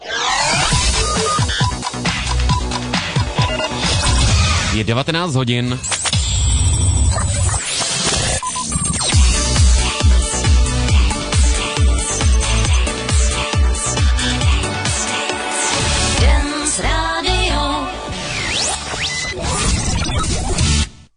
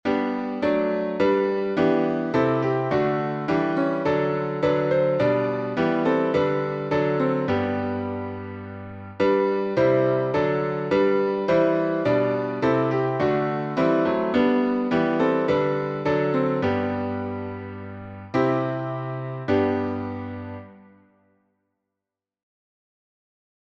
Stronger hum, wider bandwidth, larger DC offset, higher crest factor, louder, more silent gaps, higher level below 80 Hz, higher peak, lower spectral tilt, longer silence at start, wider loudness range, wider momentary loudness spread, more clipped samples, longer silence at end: neither; first, 11 kHz vs 7.2 kHz; neither; about the same, 12 dB vs 14 dB; first, -16 LUFS vs -23 LUFS; neither; first, -20 dBFS vs -58 dBFS; first, -4 dBFS vs -8 dBFS; second, -3.5 dB/octave vs -8.5 dB/octave; about the same, 0 s vs 0.05 s; about the same, 3 LU vs 5 LU; second, 5 LU vs 10 LU; neither; second, 0.2 s vs 2.9 s